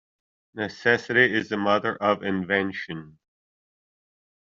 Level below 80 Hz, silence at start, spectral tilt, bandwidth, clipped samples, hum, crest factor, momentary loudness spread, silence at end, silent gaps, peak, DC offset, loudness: -68 dBFS; 0.55 s; -3 dB/octave; 7.6 kHz; under 0.1%; none; 22 dB; 15 LU; 1.35 s; none; -4 dBFS; under 0.1%; -24 LUFS